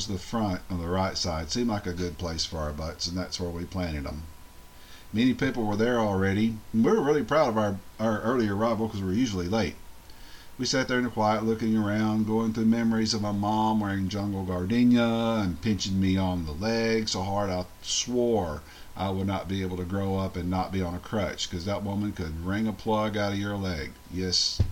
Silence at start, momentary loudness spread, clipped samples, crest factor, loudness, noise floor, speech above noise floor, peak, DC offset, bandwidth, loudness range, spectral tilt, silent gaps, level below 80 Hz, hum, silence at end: 0 s; 9 LU; under 0.1%; 18 dB; -28 LUFS; -47 dBFS; 20 dB; -10 dBFS; under 0.1%; 16.5 kHz; 5 LU; -5 dB/octave; none; -46 dBFS; none; 0 s